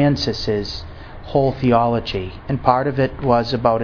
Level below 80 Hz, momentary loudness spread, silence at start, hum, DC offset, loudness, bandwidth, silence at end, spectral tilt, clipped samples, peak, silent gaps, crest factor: -36 dBFS; 11 LU; 0 s; none; under 0.1%; -19 LUFS; 5.4 kHz; 0 s; -7 dB/octave; under 0.1%; 0 dBFS; none; 18 dB